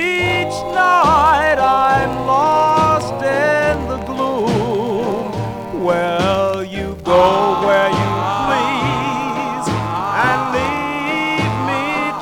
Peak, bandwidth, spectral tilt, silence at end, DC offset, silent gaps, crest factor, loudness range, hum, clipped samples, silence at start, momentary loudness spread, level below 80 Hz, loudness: -2 dBFS; 18.5 kHz; -5.5 dB/octave; 0 s; 0.2%; none; 14 dB; 4 LU; none; under 0.1%; 0 s; 8 LU; -38 dBFS; -16 LUFS